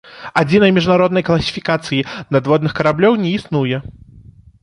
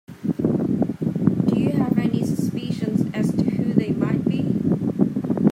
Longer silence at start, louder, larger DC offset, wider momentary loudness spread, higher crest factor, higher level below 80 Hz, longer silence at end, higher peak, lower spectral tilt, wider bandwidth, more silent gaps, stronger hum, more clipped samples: about the same, 0.05 s vs 0.1 s; first, -15 LUFS vs -22 LUFS; neither; first, 8 LU vs 4 LU; about the same, 16 dB vs 18 dB; first, -44 dBFS vs -54 dBFS; first, 0.7 s vs 0 s; first, 0 dBFS vs -4 dBFS; second, -6.5 dB/octave vs -8.5 dB/octave; second, 10.5 kHz vs 15 kHz; neither; neither; neither